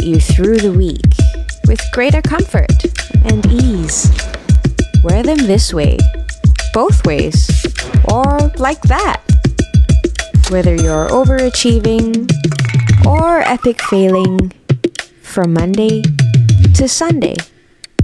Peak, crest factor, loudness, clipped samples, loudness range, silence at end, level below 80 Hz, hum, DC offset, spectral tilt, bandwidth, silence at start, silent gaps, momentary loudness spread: -2 dBFS; 10 dB; -12 LUFS; under 0.1%; 1 LU; 0 s; -16 dBFS; none; under 0.1%; -6 dB/octave; 12 kHz; 0 s; none; 5 LU